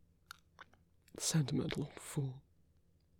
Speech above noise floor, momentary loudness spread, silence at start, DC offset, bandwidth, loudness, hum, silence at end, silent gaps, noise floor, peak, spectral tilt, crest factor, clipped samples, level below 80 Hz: 33 dB; 23 LU; 0.6 s; under 0.1%; 18.5 kHz; -38 LUFS; none; 0.8 s; none; -71 dBFS; -22 dBFS; -4.5 dB/octave; 20 dB; under 0.1%; -68 dBFS